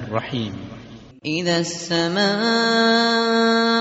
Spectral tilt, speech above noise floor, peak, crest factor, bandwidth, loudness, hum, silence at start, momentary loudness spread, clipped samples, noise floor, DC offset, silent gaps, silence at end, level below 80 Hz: -2.5 dB/octave; 21 dB; -4 dBFS; 16 dB; 8 kHz; -19 LUFS; none; 0 s; 16 LU; under 0.1%; -41 dBFS; under 0.1%; none; 0 s; -58 dBFS